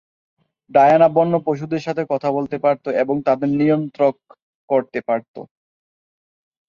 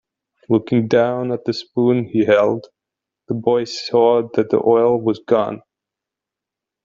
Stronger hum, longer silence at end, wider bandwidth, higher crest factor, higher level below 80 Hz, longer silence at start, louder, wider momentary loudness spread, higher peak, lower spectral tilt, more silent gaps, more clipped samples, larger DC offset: neither; about the same, 1.25 s vs 1.25 s; about the same, 7.2 kHz vs 7.6 kHz; about the same, 18 dB vs 16 dB; about the same, -62 dBFS vs -60 dBFS; first, 0.75 s vs 0.5 s; about the same, -18 LUFS vs -18 LUFS; about the same, 10 LU vs 8 LU; about the same, -2 dBFS vs -2 dBFS; first, -8.5 dB/octave vs -7 dB/octave; first, 4.42-4.68 s, 5.28-5.34 s vs none; neither; neither